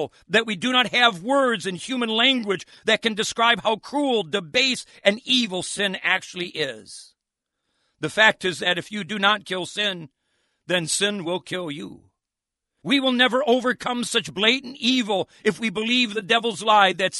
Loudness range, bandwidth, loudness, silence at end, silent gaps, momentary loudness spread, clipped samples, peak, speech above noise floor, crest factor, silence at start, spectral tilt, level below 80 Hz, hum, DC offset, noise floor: 4 LU; 11.5 kHz; -21 LUFS; 0 s; none; 11 LU; under 0.1%; -2 dBFS; 63 dB; 20 dB; 0 s; -3 dB/octave; -66 dBFS; none; under 0.1%; -86 dBFS